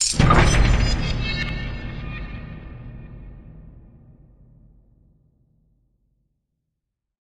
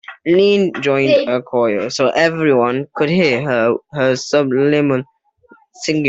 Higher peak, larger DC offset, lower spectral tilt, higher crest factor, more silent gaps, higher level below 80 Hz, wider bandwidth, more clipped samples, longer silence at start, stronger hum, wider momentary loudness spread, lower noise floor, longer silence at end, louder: about the same, -2 dBFS vs -2 dBFS; neither; about the same, -4.5 dB/octave vs -5.5 dB/octave; first, 22 dB vs 14 dB; neither; first, -28 dBFS vs -58 dBFS; first, 11.5 kHz vs 8 kHz; neither; about the same, 0 s vs 0.1 s; neither; first, 26 LU vs 5 LU; first, -81 dBFS vs -50 dBFS; first, 3.15 s vs 0 s; second, -21 LUFS vs -15 LUFS